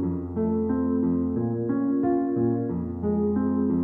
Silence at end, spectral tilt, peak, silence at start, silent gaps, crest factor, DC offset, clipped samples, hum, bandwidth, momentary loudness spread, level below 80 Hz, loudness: 0 s; -13.5 dB/octave; -14 dBFS; 0 s; none; 12 dB; under 0.1%; under 0.1%; none; 2.1 kHz; 4 LU; -48 dBFS; -25 LUFS